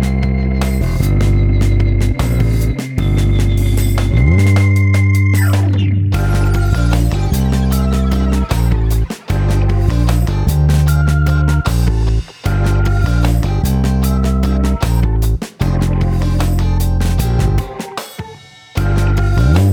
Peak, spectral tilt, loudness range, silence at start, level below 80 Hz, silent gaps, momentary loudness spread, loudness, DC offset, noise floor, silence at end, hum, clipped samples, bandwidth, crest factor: 0 dBFS; -7 dB/octave; 3 LU; 0 s; -16 dBFS; none; 6 LU; -15 LUFS; under 0.1%; -36 dBFS; 0 s; none; under 0.1%; 18 kHz; 12 dB